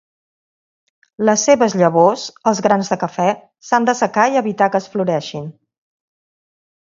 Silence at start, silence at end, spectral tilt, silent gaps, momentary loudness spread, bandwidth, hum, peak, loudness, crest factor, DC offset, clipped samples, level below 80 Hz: 1.2 s; 1.35 s; -4.5 dB/octave; none; 9 LU; 7.6 kHz; none; 0 dBFS; -16 LUFS; 18 dB; under 0.1%; under 0.1%; -64 dBFS